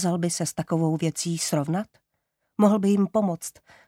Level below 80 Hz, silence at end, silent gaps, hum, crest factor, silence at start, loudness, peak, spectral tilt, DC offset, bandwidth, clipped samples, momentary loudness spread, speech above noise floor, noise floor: -66 dBFS; 0.4 s; none; none; 18 dB; 0 s; -24 LUFS; -6 dBFS; -5.5 dB/octave; under 0.1%; 16 kHz; under 0.1%; 12 LU; 53 dB; -78 dBFS